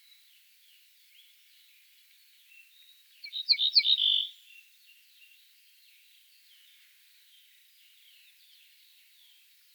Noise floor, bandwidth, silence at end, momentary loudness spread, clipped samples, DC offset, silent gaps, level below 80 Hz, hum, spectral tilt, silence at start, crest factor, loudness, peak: -61 dBFS; over 20 kHz; 5.45 s; 23 LU; under 0.1%; under 0.1%; none; under -90 dBFS; none; 9 dB/octave; 3.25 s; 26 dB; -24 LUFS; -10 dBFS